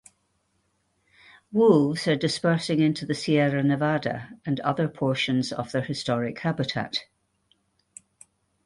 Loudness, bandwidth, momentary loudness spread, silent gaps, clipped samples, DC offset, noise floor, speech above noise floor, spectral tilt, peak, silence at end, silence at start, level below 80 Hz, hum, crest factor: -25 LUFS; 11.5 kHz; 9 LU; none; under 0.1%; under 0.1%; -71 dBFS; 47 dB; -6 dB/octave; -6 dBFS; 1.6 s; 1.5 s; -64 dBFS; none; 20 dB